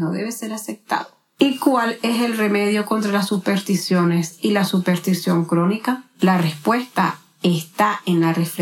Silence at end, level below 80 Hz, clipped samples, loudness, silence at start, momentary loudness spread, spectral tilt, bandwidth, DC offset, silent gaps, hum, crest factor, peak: 0 s; -74 dBFS; under 0.1%; -20 LUFS; 0 s; 7 LU; -5.5 dB/octave; 17 kHz; under 0.1%; none; none; 18 dB; -2 dBFS